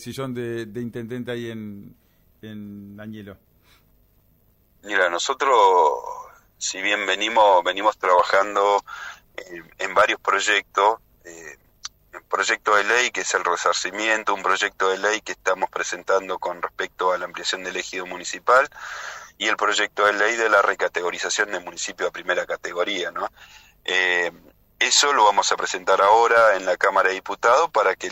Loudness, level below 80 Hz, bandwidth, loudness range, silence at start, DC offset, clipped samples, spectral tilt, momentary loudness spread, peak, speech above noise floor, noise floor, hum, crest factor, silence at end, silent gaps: -21 LUFS; -62 dBFS; 16 kHz; 7 LU; 0 s; under 0.1%; under 0.1%; -1.5 dB/octave; 19 LU; -6 dBFS; 39 dB; -60 dBFS; none; 18 dB; 0 s; none